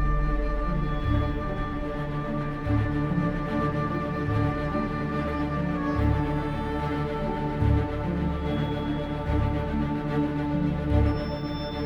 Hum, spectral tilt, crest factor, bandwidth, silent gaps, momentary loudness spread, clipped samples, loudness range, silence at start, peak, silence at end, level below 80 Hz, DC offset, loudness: none; -9 dB/octave; 14 dB; 7.2 kHz; none; 5 LU; under 0.1%; 1 LU; 0 s; -12 dBFS; 0 s; -32 dBFS; under 0.1%; -28 LUFS